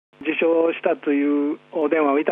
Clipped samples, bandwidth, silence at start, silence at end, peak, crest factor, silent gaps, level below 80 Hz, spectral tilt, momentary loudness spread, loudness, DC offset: under 0.1%; 3.8 kHz; 0.2 s; 0 s; -6 dBFS; 14 dB; none; -78 dBFS; -8 dB/octave; 6 LU; -21 LUFS; under 0.1%